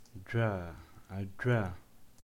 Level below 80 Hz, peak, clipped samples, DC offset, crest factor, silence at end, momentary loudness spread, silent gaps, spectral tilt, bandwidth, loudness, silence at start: -58 dBFS; -18 dBFS; under 0.1%; under 0.1%; 18 dB; 0 s; 17 LU; none; -8 dB/octave; 12 kHz; -35 LUFS; 0 s